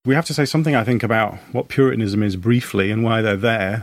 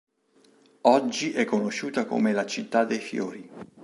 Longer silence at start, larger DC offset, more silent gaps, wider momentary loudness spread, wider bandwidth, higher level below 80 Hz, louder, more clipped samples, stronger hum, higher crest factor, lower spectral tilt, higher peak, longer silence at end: second, 0.05 s vs 0.85 s; neither; neither; second, 3 LU vs 11 LU; first, 15.5 kHz vs 11.5 kHz; first, -54 dBFS vs -76 dBFS; first, -19 LUFS vs -26 LUFS; neither; neither; second, 16 dB vs 22 dB; first, -6.5 dB/octave vs -4.5 dB/octave; about the same, -2 dBFS vs -4 dBFS; about the same, 0 s vs 0 s